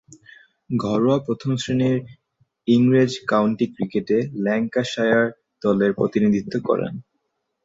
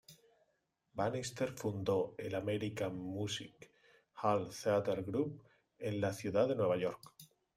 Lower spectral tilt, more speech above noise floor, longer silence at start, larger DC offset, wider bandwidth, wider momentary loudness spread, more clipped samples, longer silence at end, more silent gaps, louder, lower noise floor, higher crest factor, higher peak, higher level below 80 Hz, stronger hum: first, -7 dB/octave vs -5.5 dB/octave; first, 54 dB vs 45 dB; first, 0.7 s vs 0.1 s; neither; second, 7.8 kHz vs 16 kHz; about the same, 8 LU vs 10 LU; neither; first, 0.65 s vs 0.3 s; neither; first, -21 LUFS vs -37 LUFS; second, -74 dBFS vs -81 dBFS; about the same, 18 dB vs 20 dB; first, -4 dBFS vs -20 dBFS; first, -58 dBFS vs -72 dBFS; neither